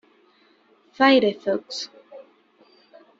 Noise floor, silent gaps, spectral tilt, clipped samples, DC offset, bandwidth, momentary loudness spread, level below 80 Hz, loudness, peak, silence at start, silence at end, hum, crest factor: -59 dBFS; none; -4 dB/octave; under 0.1%; under 0.1%; 7.8 kHz; 16 LU; -70 dBFS; -21 LUFS; -4 dBFS; 1 s; 1 s; none; 22 dB